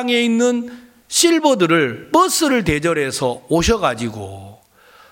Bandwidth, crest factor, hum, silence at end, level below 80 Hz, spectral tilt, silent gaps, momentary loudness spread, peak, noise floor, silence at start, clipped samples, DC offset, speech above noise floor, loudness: 17 kHz; 16 dB; none; 0.6 s; -38 dBFS; -3.5 dB/octave; none; 12 LU; -2 dBFS; -49 dBFS; 0 s; under 0.1%; under 0.1%; 32 dB; -16 LUFS